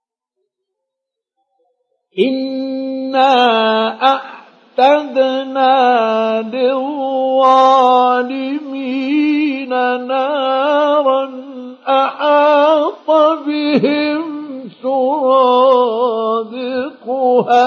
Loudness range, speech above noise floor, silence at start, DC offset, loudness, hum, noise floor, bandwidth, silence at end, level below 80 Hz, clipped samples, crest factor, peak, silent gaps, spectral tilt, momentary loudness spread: 3 LU; 68 dB; 2.15 s; under 0.1%; -14 LUFS; none; -80 dBFS; 7 kHz; 0 s; -76 dBFS; under 0.1%; 14 dB; 0 dBFS; none; -5.5 dB/octave; 11 LU